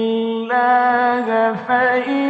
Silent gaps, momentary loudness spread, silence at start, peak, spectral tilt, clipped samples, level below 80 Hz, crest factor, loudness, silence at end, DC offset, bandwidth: none; 5 LU; 0 s; -6 dBFS; -6.5 dB/octave; under 0.1%; -68 dBFS; 12 dB; -17 LUFS; 0 s; under 0.1%; 7.6 kHz